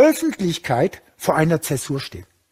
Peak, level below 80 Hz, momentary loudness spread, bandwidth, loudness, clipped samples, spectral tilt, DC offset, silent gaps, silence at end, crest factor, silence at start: -2 dBFS; -52 dBFS; 10 LU; 16 kHz; -21 LUFS; under 0.1%; -5.5 dB/octave; under 0.1%; none; 0.3 s; 18 dB; 0 s